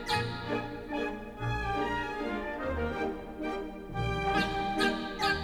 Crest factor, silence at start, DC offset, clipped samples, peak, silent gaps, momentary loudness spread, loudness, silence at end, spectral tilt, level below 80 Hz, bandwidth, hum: 18 dB; 0 s; under 0.1%; under 0.1%; -14 dBFS; none; 8 LU; -33 LUFS; 0 s; -5.5 dB/octave; -46 dBFS; 19.5 kHz; none